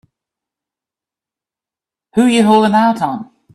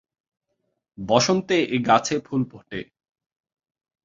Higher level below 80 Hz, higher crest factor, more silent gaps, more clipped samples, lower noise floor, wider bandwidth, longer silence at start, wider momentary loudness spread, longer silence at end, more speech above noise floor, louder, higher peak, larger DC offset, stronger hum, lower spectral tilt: about the same, -60 dBFS vs -60 dBFS; second, 16 dB vs 22 dB; neither; neither; first, -88 dBFS vs -76 dBFS; first, 13 kHz vs 7.8 kHz; first, 2.15 s vs 1 s; second, 11 LU vs 16 LU; second, 0.3 s vs 1.2 s; first, 77 dB vs 54 dB; first, -13 LUFS vs -21 LUFS; about the same, 0 dBFS vs -2 dBFS; neither; neither; about the same, -5.5 dB/octave vs -4.5 dB/octave